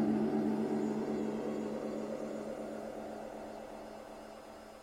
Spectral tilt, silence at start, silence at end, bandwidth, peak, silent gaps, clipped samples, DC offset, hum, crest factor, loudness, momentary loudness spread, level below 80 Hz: -7 dB/octave; 0 s; 0 s; 15 kHz; -22 dBFS; none; under 0.1%; under 0.1%; none; 16 dB; -38 LUFS; 16 LU; -66 dBFS